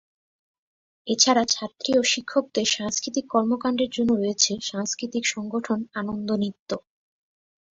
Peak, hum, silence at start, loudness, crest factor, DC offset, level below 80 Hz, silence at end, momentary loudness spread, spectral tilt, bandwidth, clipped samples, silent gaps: -4 dBFS; none; 1.05 s; -24 LUFS; 22 dB; under 0.1%; -64 dBFS; 0.95 s; 10 LU; -2.5 dB/octave; 8 kHz; under 0.1%; 6.59-6.66 s